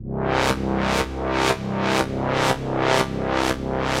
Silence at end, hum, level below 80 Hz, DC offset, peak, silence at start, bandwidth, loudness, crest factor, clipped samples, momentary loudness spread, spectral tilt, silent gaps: 0 s; none; -36 dBFS; under 0.1%; -2 dBFS; 0 s; 16 kHz; -22 LUFS; 20 dB; under 0.1%; 3 LU; -5 dB/octave; none